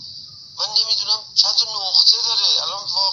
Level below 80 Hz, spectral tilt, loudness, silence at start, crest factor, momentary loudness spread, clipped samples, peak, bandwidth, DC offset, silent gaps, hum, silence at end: -68 dBFS; 2 dB/octave; -15 LUFS; 0 s; 20 dB; 15 LU; under 0.1%; 0 dBFS; 7.8 kHz; under 0.1%; none; none; 0 s